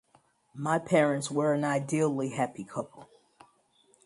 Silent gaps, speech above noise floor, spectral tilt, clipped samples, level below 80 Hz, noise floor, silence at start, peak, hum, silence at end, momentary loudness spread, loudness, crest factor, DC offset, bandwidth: none; 38 dB; -6 dB/octave; under 0.1%; -72 dBFS; -66 dBFS; 0.55 s; -10 dBFS; none; 1 s; 13 LU; -29 LUFS; 20 dB; under 0.1%; 11.5 kHz